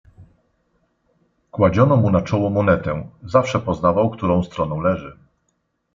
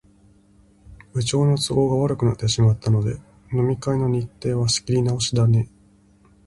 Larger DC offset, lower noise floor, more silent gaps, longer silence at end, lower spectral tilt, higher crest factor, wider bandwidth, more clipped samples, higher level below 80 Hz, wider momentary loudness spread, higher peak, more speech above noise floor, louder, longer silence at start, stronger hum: neither; first, -70 dBFS vs -55 dBFS; neither; about the same, 0.85 s vs 0.8 s; first, -8 dB/octave vs -6 dB/octave; about the same, 18 dB vs 14 dB; second, 7.6 kHz vs 11.5 kHz; neither; about the same, -48 dBFS vs -46 dBFS; first, 12 LU vs 8 LU; first, -2 dBFS vs -6 dBFS; first, 52 dB vs 35 dB; about the same, -19 LUFS vs -21 LUFS; second, 0.2 s vs 0.9 s; neither